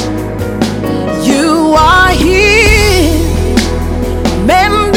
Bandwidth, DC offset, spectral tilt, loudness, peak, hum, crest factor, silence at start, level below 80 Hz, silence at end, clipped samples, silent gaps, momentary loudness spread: 19 kHz; under 0.1%; -4.5 dB/octave; -9 LUFS; 0 dBFS; none; 10 dB; 0 s; -18 dBFS; 0 s; under 0.1%; none; 9 LU